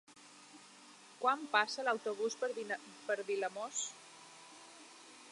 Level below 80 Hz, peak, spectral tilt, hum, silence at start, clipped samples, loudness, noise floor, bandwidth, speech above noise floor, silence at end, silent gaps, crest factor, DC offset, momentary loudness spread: under -90 dBFS; -16 dBFS; -1 dB/octave; none; 0.1 s; under 0.1%; -37 LUFS; -59 dBFS; 11.5 kHz; 22 dB; 0 s; none; 24 dB; under 0.1%; 23 LU